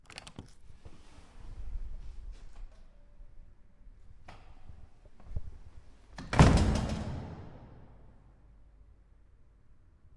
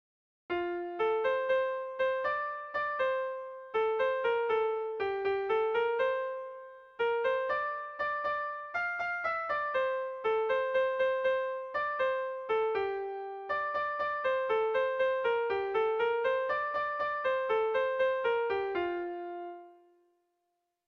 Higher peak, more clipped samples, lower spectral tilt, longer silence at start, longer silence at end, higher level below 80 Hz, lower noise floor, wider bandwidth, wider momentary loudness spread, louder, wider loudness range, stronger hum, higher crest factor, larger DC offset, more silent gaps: first, -8 dBFS vs -20 dBFS; neither; first, -6.5 dB/octave vs -5 dB/octave; second, 0.1 s vs 0.5 s; first, 2.2 s vs 1.15 s; first, -40 dBFS vs -70 dBFS; second, -59 dBFS vs -82 dBFS; first, 11.5 kHz vs 6.4 kHz; first, 32 LU vs 7 LU; about the same, -30 LUFS vs -32 LUFS; first, 22 LU vs 2 LU; neither; first, 28 dB vs 12 dB; neither; neither